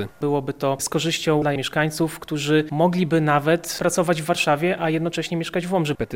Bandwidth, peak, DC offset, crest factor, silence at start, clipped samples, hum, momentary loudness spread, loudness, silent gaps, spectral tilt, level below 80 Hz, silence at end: 17 kHz; -4 dBFS; 0.3%; 18 dB; 0 s; under 0.1%; none; 6 LU; -22 LUFS; none; -5 dB/octave; -54 dBFS; 0 s